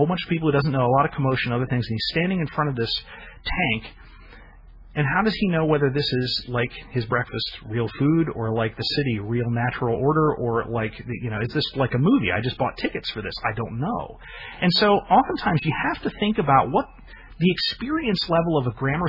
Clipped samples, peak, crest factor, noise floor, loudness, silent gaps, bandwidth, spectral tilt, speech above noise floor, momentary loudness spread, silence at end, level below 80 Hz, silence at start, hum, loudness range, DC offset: under 0.1%; -4 dBFS; 18 dB; -46 dBFS; -23 LUFS; none; 5.8 kHz; -8 dB/octave; 23 dB; 9 LU; 0 s; -44 dBFS; 0 s; none; 3 LU; under 0.1%